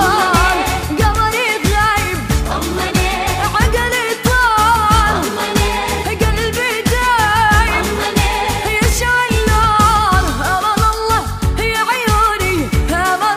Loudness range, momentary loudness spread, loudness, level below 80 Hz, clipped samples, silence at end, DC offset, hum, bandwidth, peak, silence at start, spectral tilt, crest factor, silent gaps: 2 LU; 5 LU; -14 LUFS; -22 dBFS; under 0.1%; 0 s; under 0.1%; none; 15.5 kHz; 0 dBFS; 0 s; -4 dB/octave; 14 dB; none